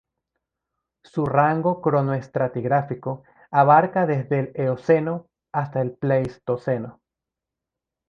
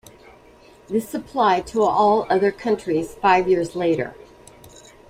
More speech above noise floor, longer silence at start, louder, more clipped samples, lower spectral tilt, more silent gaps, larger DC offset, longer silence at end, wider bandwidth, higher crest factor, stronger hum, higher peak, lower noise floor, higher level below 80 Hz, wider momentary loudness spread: first, 65 dB vs 30 dB; first, 1.15 s vs 0.9 s; about the same, -22 LUFS vs -20 LUFS; neither; first, -9.5 dB/octave vs -5.5 dB/octave; neither; neither; first, 1.15 s vs 0.95 s; second, 6.8 kHz vs 16 kHz; about the same, 20 dB vs 18 dB; neither; about the same, -2 dBFS vs -4 dBFS; first, -86 dBFS vs -49 dBFS; second, -60 dBFS vs -54 dBFS; first, 13 LU vs 9 LU